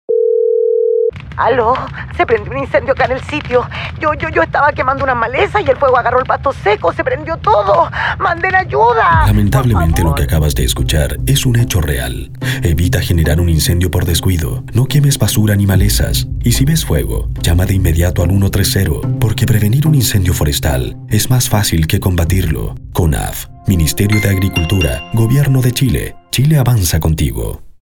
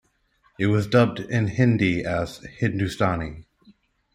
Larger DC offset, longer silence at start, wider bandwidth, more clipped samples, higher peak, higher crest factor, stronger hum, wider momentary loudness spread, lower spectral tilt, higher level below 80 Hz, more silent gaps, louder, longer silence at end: neither; second, 0.1 s vs 0.6 s; first, 19 kHz vs 14.5 kHz; neither; first, 0 dBFS vs -4 dBFS; second, 12 dB vs 20 dB; neither; second, 6 LU vs 9 LU; second, -5.5 dB/octave vs -7 dB/octave; first, -24 dBFS vs -50 dBFS; neither; first, -13 LUFS vs -23 LUFS; second, 0.15 s vs 0.7 s